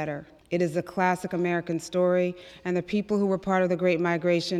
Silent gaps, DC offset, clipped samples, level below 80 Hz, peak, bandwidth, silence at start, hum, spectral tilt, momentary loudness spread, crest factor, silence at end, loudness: none; under 0.1%; under 0.1%; -62 dBFS; -8 dBFS; 13.5 kHz; 0 s; none; -6.5 dB/octave; 7 LU; 18 dB; 0 s; -26 LUFS